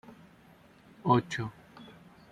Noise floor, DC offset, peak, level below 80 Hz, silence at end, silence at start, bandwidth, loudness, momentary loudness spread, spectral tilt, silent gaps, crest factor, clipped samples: -58 dBFS; under 0.1%; -10 dBFS; -68 dBFS; 0.4 s; 0.1 s; 12 kHz; -30 LUFS; 25 LU; -6.5 dB/octave; none; 24 dB; under 0.1%